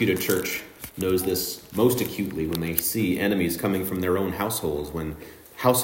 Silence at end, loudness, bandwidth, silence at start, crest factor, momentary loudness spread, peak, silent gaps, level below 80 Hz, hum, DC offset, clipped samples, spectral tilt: 0 s; -25 LUFS; 16.5 kHz; 0 s; 22 dB; 10 LU; -2 dBFS; none; -52 dBFS; none; under 0.1%; under 0.1%; -4.5 dB/octave